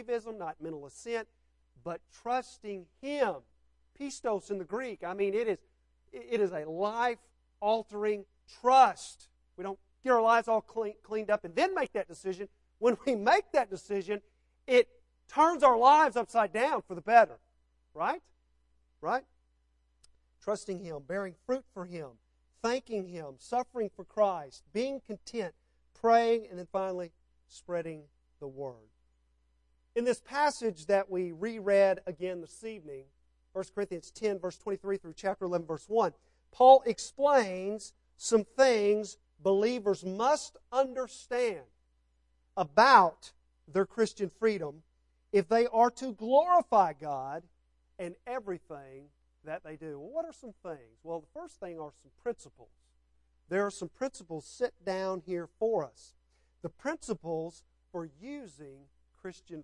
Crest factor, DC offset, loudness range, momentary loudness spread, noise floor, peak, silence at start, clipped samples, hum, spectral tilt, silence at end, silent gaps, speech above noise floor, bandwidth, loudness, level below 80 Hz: 26 dB; under 0.1%; 13 LU; 19 LU; -72 dBFS; -6 dBFS; 0 s; under 0.1%; none; -4.5 dB/octave; 0 s; none; 42 dB; 11.5 kHz; -30 LUFS; -68 dBFS